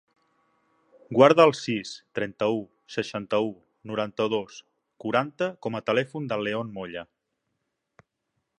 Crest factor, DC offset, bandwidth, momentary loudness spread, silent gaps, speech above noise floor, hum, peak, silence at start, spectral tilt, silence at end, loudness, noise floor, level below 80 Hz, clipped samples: 26 dB; under 0.1%; 9.8 kHz; 16 LU; none; 54 dB; none; -2 dBFS; 1.1 s; -5.5 dB/octave; 1.55 s; -26 LUFS; -80 dBFS; -70 dBFS; under 0.1%